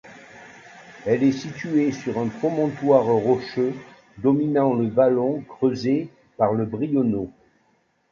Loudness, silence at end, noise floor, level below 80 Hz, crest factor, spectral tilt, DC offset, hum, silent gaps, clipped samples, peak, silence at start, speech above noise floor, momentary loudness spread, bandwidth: -22 LUFS; 0.85 s; -65 dBFS; -60 dBFS; 20 dB; -8 dB/octave; under 0.1%; none; none; under 0.1%; -4 dBFS; 0.05 s; 44 dB; 8 LU; 7.2 kHz